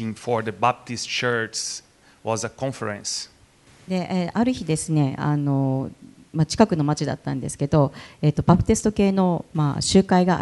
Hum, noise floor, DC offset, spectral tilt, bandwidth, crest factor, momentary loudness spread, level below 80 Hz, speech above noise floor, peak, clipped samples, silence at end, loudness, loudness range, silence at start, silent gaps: none; -53 dBFS; under 0.1%; -5.5 dB/octave; 11.5 kHz; 22 dB; 10 LU; -46 dBFS; 31 dB; 0 dBFS; under 0.1%; 0 s; -23 LUFS; 6 LU; 0 s; none